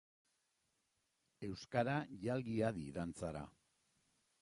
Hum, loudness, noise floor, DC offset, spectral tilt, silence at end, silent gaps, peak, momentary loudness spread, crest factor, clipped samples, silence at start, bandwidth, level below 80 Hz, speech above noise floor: none; -42 LUFS; -84 dBFS; under 0.1%; -7 dB/octave; 0.9 s; none; -22 dBFS; 12 LU; 22 dB; under 0.1%; 1.4 s; 11.5 kHz; -68 dBFS; 43 dB